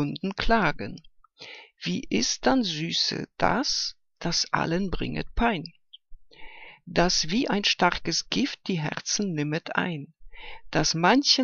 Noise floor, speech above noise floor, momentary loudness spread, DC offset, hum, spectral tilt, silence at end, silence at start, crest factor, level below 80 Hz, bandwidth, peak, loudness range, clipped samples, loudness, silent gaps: -47 dBFS; 21 dB; 21 LU; under 0.1%; none; -3.5 dB/octave; 0 s; 0 s; 22 dB; -42 dBFS; 7.4 kHz; -6 dBFS; 2 LU; under 0.1%; -25 LUFS; none